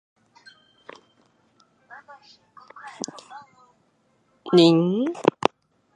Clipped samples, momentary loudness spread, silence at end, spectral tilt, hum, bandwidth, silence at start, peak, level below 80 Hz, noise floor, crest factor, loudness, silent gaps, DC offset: under 0.1%; 29 LU; 0.65 s; -6 dB/octave; none; 11 kHz; 2.85 s; 0 dBFS; -70 dBFS; -66 dBFS; 26 dB; -21 LUFS; none; under 0.1%